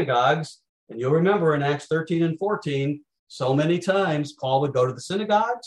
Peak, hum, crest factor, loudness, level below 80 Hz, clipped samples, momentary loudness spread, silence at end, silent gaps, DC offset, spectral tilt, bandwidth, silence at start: -8 dBFS; none; 16 dB; -23 LUFS; -68 dBFS; under 0.1%; 9 LU; 0 s; 0.69-0.87 s, 3.19-3.27 s; under 0.1%; -6.5 dB/octave; 11.5 kHz; 0 s